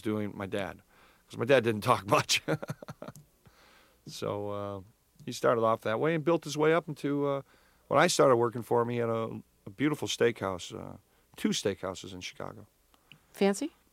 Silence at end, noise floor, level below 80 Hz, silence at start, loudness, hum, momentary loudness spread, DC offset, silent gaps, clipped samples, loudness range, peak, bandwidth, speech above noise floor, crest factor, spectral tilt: 0.25 s; -61 dBFS; -68 dBFS; 0.05 s; -30 LUFS; none; 18 LU; under 0.1%; none; under 0.1%; 7 LU; -8 dBFS; 16.5 kHz; 31 dB; 22 dB; -4.5 dB/octave